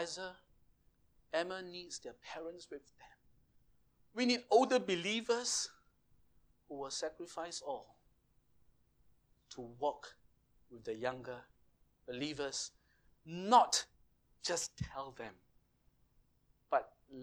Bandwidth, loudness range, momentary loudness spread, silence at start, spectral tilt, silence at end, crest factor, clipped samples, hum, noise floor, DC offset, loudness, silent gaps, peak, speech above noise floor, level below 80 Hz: over 20 kHz; 11 LU; 21 LU; 0 s; -2.5 dB/octave; 0 s; 28 dB; under 0.1%; none; -74 dBFS; under 0.1%; -37 LUFS; none; -14 dBFS; 36 dB; -70 dBFS